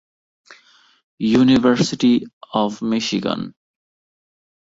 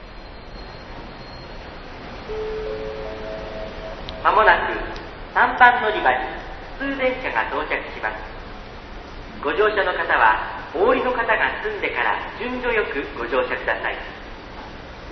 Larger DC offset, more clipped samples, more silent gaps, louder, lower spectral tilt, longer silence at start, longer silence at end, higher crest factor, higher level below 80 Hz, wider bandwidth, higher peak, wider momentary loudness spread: neither; neither; first, 2.33-2.41 s vs none; first, -18 LUFS vs -21 LUFS; about the same, -5.5 dB/octave vs -5.5 dB/octave; first, 1.2 s vs 0 s; first, 1.2 s vs 0 s; about the same, 18 dB vs 22 dB; second, -54 dBFS vs -40 dBFS; first, 7.8 kHz vs 6.4 kHz; about the same, -2 dBFS vs 0 dBFS; second, 11 LU vs 21 LU